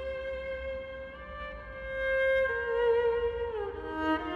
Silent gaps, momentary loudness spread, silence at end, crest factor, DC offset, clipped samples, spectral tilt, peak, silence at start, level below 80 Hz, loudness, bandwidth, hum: none; 15 LU; 0 s; 14 dB; under 0.1%; under 0.1%; -6.5 dB/octave; -18 dBFS; 0 s; -48 dBFS; -31 LUFS; 6.8 kHz; none